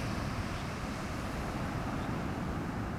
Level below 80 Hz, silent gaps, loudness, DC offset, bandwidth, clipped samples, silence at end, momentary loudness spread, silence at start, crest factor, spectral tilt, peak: -46 dBFS; none; -37 LUFS; under 0.1%; 16 kHz; under 0.1%; 0 s; 2 LU; 0 s; 12 dB; -6 dB/octave; -24 dBFS